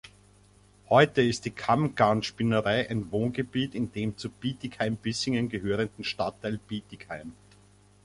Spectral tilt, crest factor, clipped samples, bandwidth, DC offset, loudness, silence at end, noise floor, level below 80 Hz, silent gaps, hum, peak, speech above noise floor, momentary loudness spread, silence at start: -5.5 dB/octave; 22 dB; under 0.1%; 11.5 kHz; under 0.1%; -28 LUFS; 0.7 s; -58 dBFS; -56 dBFS; none; 50 Hz at -50 dBFS; -8 dBFS; 31 dB; 13 LU; 0.05 s